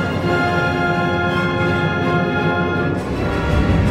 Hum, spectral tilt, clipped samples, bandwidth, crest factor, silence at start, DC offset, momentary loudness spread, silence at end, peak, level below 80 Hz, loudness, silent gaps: none; -7 dB/octave; under 0.1%; 13.5 kHz; 12 dB; 0 s; under 0.1%; 3 LU; 0 s; -4 dBFS; -30 dBFS; -18 LUFS; none